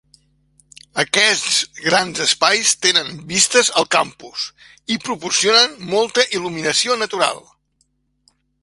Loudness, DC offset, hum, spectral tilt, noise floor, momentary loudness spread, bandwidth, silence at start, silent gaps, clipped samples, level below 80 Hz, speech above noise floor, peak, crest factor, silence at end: -16 LUFS; under 0.1%; none; -1 dB/octave; -65 dBFS; 13 LU; 11.5 kHz; 0.95 s; none; under 0.1%; -60 dBFS; 48 dB; 0 dBFS; 20 dB; 1.25 s